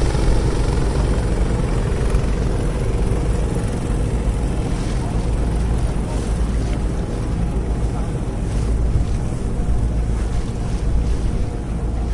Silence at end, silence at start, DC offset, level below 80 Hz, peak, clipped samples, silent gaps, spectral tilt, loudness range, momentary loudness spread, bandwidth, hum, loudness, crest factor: 0 s; 0 s; under 0.1%; -20 dBFS; -4 dBFS; under 0.1%; none; -7 dB/octave; 2 LU; 4 LU; 11.5 kHz; none; -22 LUFS; 14 dB